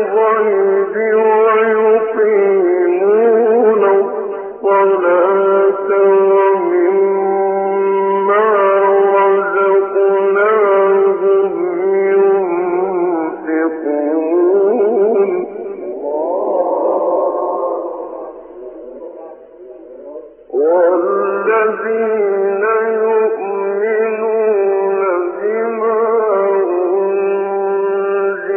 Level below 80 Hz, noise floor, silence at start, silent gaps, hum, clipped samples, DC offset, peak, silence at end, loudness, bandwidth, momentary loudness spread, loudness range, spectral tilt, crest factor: -62 dBFS; -36 dBFS; 0 s; none; none; under 0.1%; under 0.1%; -2 dBFS; 0 s; -14 LUFS; 3.2 kHz; 10 LU; 6 LU; -5 dB/octave; 12 dB